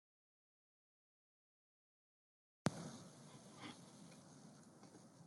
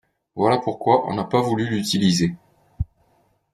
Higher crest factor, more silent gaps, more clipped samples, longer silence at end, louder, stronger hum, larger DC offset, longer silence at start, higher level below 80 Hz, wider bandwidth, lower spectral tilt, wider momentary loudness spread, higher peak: first, 38 dB vs 20 dB; neither; neither; second, 0 s vs 0.7 s; second, -52 LUFS vs -21 LUFS; neither; neither; first, 2.65 s vs 0.35 s; second, -86 dBFS vs -44 dBFS; first, 15.5 kHz vs 14 kHz; about the same, -5 dB/octave vs -5.5 dB/octave; first, 17 LU vs 13 LU; second, -18 dBFS vs -2 dBFS